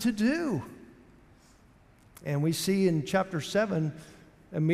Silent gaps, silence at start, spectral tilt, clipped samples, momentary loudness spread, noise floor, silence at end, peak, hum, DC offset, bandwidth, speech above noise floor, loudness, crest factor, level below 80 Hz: none; 0 s; -6 dB/octave; under 0.1%; 13 LU; -59 dBFS; 0 s; -14 dBFS; none; under 0.1%; 16 kHz; 31 dB; -29 LUFS; 16 dB; -62 dBFS